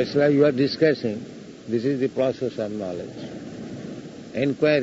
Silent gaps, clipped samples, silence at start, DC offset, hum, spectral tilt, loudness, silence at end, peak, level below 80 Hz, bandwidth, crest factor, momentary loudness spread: none; under 0.1%; 0 s; under 0.1%; none; -7 dB/octave; -23 LUFS; 0 s; -6 dBFS; -62 dBFS; 8 kHz; 18 dB; 17 LU